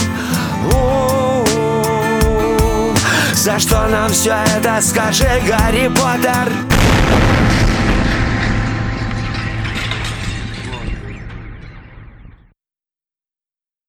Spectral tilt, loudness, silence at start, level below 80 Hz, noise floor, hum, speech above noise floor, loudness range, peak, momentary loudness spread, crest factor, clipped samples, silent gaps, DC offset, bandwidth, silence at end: -4.5 dB/octave; -15 LUFS; 0 s; -24 dBFS; under -90 dBFS; none; over 77 dB; 12 LU; 0 dBFS; 12 LU; 14 dB; under 0.1%; none; under 0.1%; over 20 kHz; 1.6 s